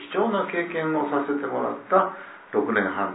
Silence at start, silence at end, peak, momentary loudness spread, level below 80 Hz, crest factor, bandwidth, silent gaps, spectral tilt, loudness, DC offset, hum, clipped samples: 0 s; 0 s; -6 dBFS; 6 LU; -74 dBFS; 20 dB; 4 kHz; none; -10 dB/octave; -25 LUFS; under 0.1%; none; under 0.1%